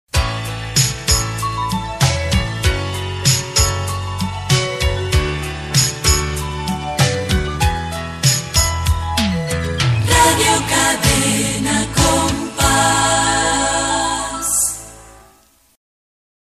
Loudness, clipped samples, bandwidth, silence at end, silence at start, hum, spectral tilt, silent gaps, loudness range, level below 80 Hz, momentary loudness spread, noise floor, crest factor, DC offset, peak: -16 LUFS; under 0.1%; 15 kHz; 1.3 s; 0.15 s; none; -3 dB/octave; none; 4 LU; -28 dBFS; 9 LU; -52 dBFS; 16 dB; under 0.1%; 0 dBFS